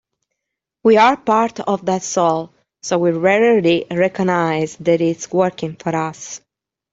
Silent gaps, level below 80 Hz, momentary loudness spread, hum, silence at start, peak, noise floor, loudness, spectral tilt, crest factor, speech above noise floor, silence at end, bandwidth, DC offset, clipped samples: none; -60 dBFS; 12 LU; none; 0.85 s; -2 dBFS; -81 dBFS; -17 LUFS; -5 dB/octave; 16 dB; 64 dB; 0.55 s; 8 kHz; under 0.1%; under 0.1%